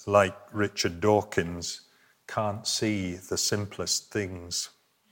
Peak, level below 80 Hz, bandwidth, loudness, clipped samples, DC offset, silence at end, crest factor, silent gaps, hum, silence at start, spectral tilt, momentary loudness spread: -6 dBFS; -64 dBFS; 17 kHz; -28 LUFS; under 0.1%; under 0.1%; 0.45 s; 22 dB; none; none; 0 s; -3.5 dB/octave; 10 LU